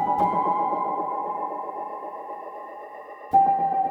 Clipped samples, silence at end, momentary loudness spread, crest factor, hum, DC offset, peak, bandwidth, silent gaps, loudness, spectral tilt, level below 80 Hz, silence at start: under 0.1%; 0 s; 18 LU; 18 dB; none; under 0.1%; -8 dBFS; 4.2 kHz; none; -25 LUFS; -8 dB/octave; -64 dBFS; 0 s